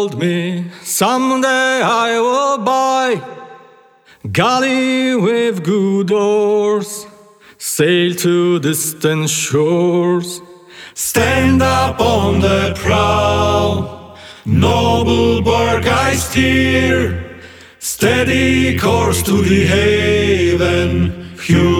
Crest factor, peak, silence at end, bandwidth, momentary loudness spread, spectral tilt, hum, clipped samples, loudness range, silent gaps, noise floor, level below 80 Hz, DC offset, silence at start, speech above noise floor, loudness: 14 dB; -2 dBFS; 0 s; 19 kHz; 9 LU; -5 dB/octave; none; under 0.1%; 2 LU; none; -47 dBFS; -34 dBFS; under 0.1%; 0 s; 33 dB; -14 LUFS